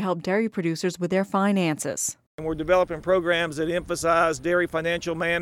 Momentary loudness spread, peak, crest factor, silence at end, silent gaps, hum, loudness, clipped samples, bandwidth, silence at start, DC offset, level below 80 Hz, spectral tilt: 6 LU; -8 dBFS; 16 dB; 0 s; 2.27-2.38 s; none; -24 LUFS; under 0.1%; 16.5 kHz; 0 s; under 0.1%; -50 dBFS; -4.5 dB/octave